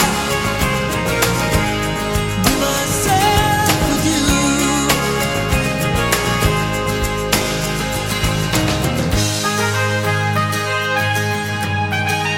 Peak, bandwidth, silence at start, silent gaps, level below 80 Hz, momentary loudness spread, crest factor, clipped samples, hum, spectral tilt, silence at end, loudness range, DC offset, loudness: 0 dBFS; 17 kHz; 0 s; none; -30 dBFS; 5 LU; 16 dB; under 0.1%; none; -4 dB/octave; 0 s; 2 LU; under 0.1%; -17 LUFS